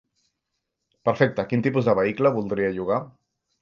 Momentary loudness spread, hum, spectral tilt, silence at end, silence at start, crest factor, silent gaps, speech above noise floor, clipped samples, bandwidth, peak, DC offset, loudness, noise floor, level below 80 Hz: 6 LU; none; -8.5 dB/octave; 0.5 s; 1.05 s; 20 dB; none; 58 dB; under 0.1%; 7 kHz; -4 dBFS; under 0.1%; -23 LUFS; -80 dBFS; -58 dBFS